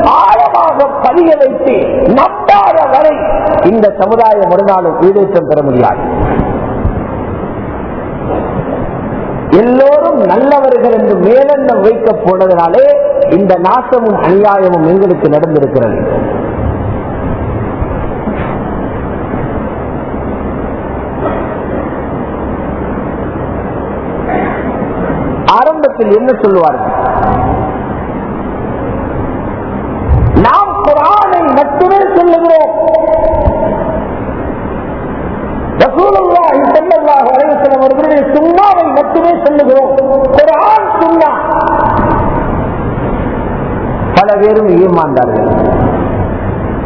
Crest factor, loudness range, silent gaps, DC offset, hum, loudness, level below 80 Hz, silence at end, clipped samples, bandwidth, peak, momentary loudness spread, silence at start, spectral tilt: 10 dB; 9 LU; none; under 0.1%; none; -10 LUFS; -24 dBFS; 0 s; 2%; 5.4 kHz; 0 dBFS; 11 LU; 0 s; -9.5 dB/octave